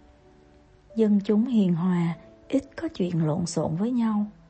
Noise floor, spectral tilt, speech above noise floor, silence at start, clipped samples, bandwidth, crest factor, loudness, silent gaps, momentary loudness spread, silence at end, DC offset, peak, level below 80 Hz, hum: -55 dBFS; -7.5 dB/octave; 31 dB; 0.9 s; under 0.1%; 8.8 kHz; 16 dB; -25 LUFS; none; 8 LU; 0.2 s; under 0.1%; -10 dBFS; -58 dBFS; none